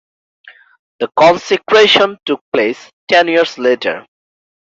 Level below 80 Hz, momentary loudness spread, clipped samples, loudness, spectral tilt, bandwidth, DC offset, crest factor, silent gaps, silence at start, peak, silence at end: -58 dBFS; 12 LU; under 0.1%; -12 LUFS; -3.5 dB/octave; 7.8 kHz; under 0.1%; 14 dB; 2.41-2.52 s, 2.93-3.07 s; 1 s; 0 dBFS; 0.7 s